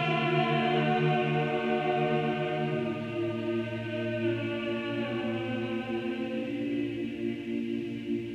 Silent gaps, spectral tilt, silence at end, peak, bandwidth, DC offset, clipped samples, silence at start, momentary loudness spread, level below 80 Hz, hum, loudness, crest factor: none; -7.5 dB/octave; 0 s; -14 dBFS; 8.6 kHz; under 0.1%; under 0.1%; 0 s; 7 LU; -64 dBFS; none; -30 LUFS; 14 dB